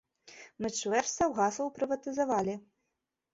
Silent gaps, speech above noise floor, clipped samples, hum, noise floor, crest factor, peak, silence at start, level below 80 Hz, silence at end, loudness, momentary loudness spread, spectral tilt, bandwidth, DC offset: none; 54 dB; under 0.1%; none; -85 dBFS; 18 dB; -16 dBFS; 0.25 s; -66 dBFS; 0.75 s; -32 LUFS; 13 LU; -3.5 dB/octave; 7.8 kHz; under 0.1%